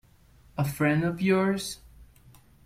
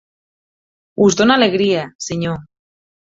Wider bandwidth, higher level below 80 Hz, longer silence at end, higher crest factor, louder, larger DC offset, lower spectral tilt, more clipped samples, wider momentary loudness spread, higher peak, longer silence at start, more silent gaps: first, 16 kHz vs 7.8 kHz; about the same, -56 dBFS vs -54 dBFS; about the same, 0.6 s vs 0.65 s; about the same, 18 dB vs 16 dB; second, -27 LUFS vs -15 LUFS; neither; first, -6 dB/octave vs -4.5 dB/octave; neither; about the same, 14 LU vs 14 LU; second, -12 dBFS vs -2 dBFS; second, 0.55 s vs 1 s; second, none vs 1.95-1.99 s